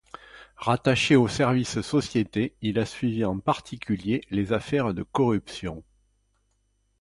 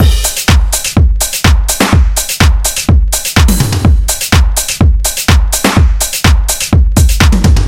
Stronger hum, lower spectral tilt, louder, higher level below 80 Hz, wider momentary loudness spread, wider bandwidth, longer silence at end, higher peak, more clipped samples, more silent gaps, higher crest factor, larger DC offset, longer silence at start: first, 50 Hz at -50 dBFS vs none; first, -6 dB/octave vs -4 dB/octave; second, -25 LUFS vs -10 LUFS; second, -52 dBFS vs -10 dBFS; first, 13 LU vs 2 LU; second, 11.5 kHz vs 17 kHz; first, 1.2 s vs 0 s; second, -8 dBFS vs 0 dBFS; second, under 0.1% vs 0.2%; neither; first, 18 dB vs 8 dB; second, under 0.1% vs 0.2%; first, 0.35 s vs 0 s